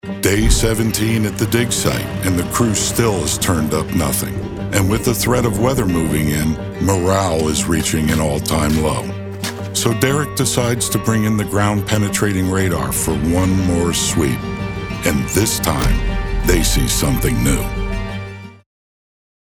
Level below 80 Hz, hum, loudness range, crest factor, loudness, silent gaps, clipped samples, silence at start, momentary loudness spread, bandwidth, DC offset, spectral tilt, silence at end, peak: -26 dBFS; none; 1 LU; 16 dB; -17 LUFS; none; under 0.1%; 0.05 s; 7 LU; 18 kHz; under 0.1%; -4.5 dB/octave; 1.05 s; -2 dBFS